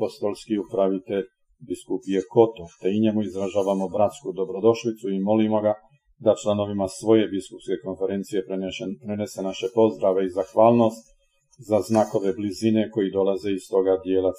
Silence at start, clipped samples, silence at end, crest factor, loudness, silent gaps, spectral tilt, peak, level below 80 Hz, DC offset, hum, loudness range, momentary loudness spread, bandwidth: 0 s; under 0.1%; 0 s; 20 dB; -24 LUFS; none; -6.5 dB/octave; -2 dBFS; -62 dBFS; under 0.1%; none; 3 LU; 10 LU; 14.5 kHz